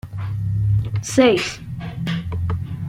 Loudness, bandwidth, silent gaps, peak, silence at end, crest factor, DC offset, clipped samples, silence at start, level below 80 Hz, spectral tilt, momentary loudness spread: -21 LUFS; 14 kHz; none; -2 dBFS; 0 s; 18 dB; under 0.1%; under 0.1%; 0.05 s; -40 dBFS; -6 dB/octave; 12 LU